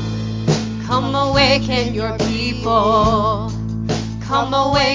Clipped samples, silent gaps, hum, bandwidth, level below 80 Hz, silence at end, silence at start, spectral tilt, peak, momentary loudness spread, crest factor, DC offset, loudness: under 0.1%; none; none; 7.6 kHz; -32 dBFS; 0 s; 0 s; -5.5 dB/octave; 0 dBFS; 9 LU; 16 dB; under 0.1%; -17 LUFS